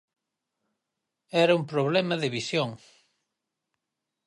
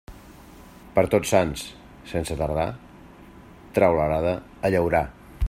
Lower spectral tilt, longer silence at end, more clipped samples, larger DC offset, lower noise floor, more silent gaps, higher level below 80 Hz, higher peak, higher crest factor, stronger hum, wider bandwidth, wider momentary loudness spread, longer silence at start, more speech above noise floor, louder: about the same, -5.5 dB/octave vs -6 dB/octave; first, 1.5 s vs 0 s; neither; neither; first, -85 dBFS vs -46 dBFS; neither; second, -76 dBFS vs -40 dBFS; second, -10 dBFS vs -4 dBFS; about the same, 20 dB vs 20 dB; neither; second, 11.5 kHz vs 16 kHz; second, 7 LU vs 14 LU; first, 1.35 s vs 0.1 s; first, 60 dB vs 24 dB; about the same, -26 LUFS vs -24 LUFS